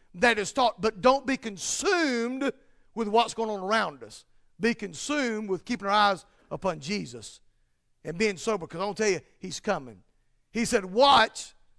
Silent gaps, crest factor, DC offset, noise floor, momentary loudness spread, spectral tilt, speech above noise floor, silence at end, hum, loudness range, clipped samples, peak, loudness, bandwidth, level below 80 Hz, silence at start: none; 20 dB; under 0.1%; -68 dBFS; 15 LU; -3 dB/octave; 42 dB; 0.3 s; none; 5 LU; under 0.1%; -8 dBFS; -27 LUFS; 11 kHz; -58 dBFS; 0.15 s